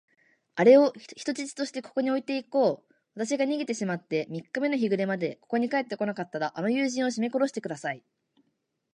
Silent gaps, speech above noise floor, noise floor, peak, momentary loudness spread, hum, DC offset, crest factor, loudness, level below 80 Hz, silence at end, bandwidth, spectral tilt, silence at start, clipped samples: none; 50 dB; -77 dBFS; -8 dBFS; 11 LU; none; under 0.1%; 20 dB; -27 LUFS; -82 dBFS; 0.95 s; 10.5 kHz; -5 dB/octave; 0.55 s; under 0.1%